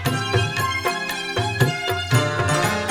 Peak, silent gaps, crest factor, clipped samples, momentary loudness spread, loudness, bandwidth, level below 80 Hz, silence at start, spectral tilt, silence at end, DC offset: -6 dBFS; none; 16 dB; under 0.1%; 4 LU; -21 LUFS; 19.5 kHz; -48 dBFS; 0 s; -4.5 dB/octave; 0 s; under 0.1%